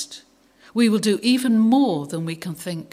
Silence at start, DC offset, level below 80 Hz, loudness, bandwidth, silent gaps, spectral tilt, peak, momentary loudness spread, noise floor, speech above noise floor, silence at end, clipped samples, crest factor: 0 s; under 0.1%; -70 dBFS; -20 LUFS; 15.5 kHz; none; -5 dB/octave; -6 dBFS; 13 LU; -53 dBFS; 34 dB; 0.1 s; under 0.1%; 14 dB